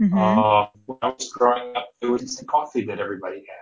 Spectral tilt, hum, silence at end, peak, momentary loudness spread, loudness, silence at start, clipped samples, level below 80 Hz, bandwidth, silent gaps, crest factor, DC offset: -5.5 dB/octave; none; 0 s; -4 dBFS; 13 LU; -22 LUFS; 0 s; under 0.1%; -60 dBFS; 8 kHz; none; 18 dB; under 0.1%